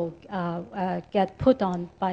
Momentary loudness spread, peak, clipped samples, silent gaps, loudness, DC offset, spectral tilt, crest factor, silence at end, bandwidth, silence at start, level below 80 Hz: 9 LU; -6 dBFS; under 0.1%; none; -27 LUFS; under 0.1%; -8.5 dB/octave; 20 dB; 0 s; 7.8 kHz; 0 s; -54 dBFS